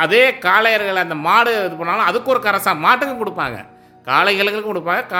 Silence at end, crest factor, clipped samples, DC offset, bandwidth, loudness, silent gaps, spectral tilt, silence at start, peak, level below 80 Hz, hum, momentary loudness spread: 0 s; 16 dB; under 0.1%; under 0.1%; 17 kHz; -16 LUFS; none; -3.5 dB/octave; 0 s; 0 dBFS; -60 dBFS; none; 10 LU